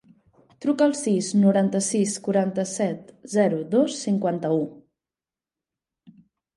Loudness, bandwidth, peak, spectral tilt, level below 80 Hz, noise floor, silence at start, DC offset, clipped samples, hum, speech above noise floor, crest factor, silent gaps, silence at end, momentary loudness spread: -23 LUFS; 11.5 kHz; -8 dBFS; -5.5 dB/octave; -72 dBFS; under -90 dBFS; 0.6 s; under 0.1%; under 0.1%; none; over 68 dB; 16 dB; none; 1.75 s; 8 LU